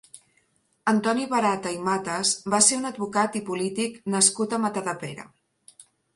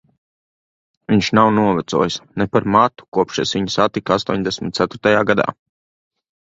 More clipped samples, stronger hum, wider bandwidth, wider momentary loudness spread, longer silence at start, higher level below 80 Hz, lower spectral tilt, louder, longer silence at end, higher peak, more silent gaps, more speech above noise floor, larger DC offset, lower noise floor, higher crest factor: neither; neither; first, 11.5 kHz vs 7.8 kHz; first, 11 LU vs 7 LU; second, 0.15 s vs 1.1 s; second, -68 dBFS vs -50 dBFS; second, -2.5 dB/octave vs -5.5 dB/octave; second, -24 LUFS vs -17 LUFS; second, 0.35 s vs 1.05 s; second, -4 dBFS vs 0 dBFS; second, none vs 3.08-3.12 s; second, 43 dB vs over 73 dB; neither; second, -67 dBFS vs under -90 dBFS; about the same, 22 dB vs 18 dB